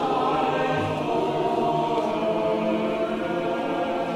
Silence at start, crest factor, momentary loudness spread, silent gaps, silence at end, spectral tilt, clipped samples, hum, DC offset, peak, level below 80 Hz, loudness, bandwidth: 0 s; 14 dB; 3 LU; none; 0 s; -6.5 dB/octave; under 0.1%; none; under 0.1%; -10 dBFS; -58 dBFS; -24 LUFS; 14.5 kHz